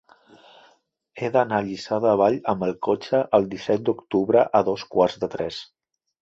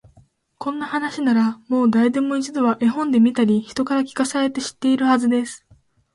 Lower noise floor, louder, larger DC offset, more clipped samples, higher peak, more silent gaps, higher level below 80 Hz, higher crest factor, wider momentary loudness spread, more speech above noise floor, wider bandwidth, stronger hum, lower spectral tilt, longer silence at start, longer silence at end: first, -62 dBFS vs -56 dBFS; about the same, -22 LUFS vs -20 LUFS; neither; neither; about the same, -4 dBFS vs -6 dBFS; neither; about the same, -60 dBFS vs -62 dBFS; first, 20 dB vs 14 dB; about the same, 9 LU vs 8 LU; about the same, 40 dB vs 37 dB; second, 7.8 kHz vs 11.5 kHz; neither; first, -6.5 dB/octave vs -5 dB/octave; first, 1.15 s vs 0.6 s; about the same, 0.6 s vs 0.6 s